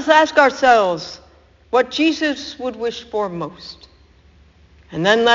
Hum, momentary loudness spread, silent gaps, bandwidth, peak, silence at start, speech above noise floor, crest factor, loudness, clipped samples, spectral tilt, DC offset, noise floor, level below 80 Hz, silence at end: none; 19 LU; none; 7.6 kHz; 0 dBFS; 0 s; 33 dB; 18 dB; -17 LUFS; under 0.1%; -1.5 dB/octave; under 0.1%; -50 dBFS; -52 dBFS; 0 s